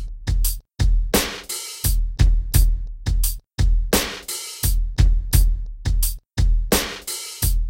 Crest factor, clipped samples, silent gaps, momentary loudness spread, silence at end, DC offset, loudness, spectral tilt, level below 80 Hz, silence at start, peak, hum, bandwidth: 16 dB; under 0.1%; none; 8 LU; 0 s; under 0.1%; -22 LUFS; -4 dB/octave; -20 dBFS; 0 s; -4 dBFS; none; 17 kHz